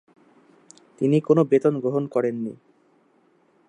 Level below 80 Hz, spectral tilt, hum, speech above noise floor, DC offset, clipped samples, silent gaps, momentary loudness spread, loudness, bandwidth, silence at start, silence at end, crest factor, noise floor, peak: -74 dBFS; -8.5 dB/octave; none; 41 dB; under 0.1%; under 0.1%; none; 10 LU; -22 LUFS; 10 kHz; 1 s; 1.15 s; 20 dB; -62 dBFS; -4 dBFS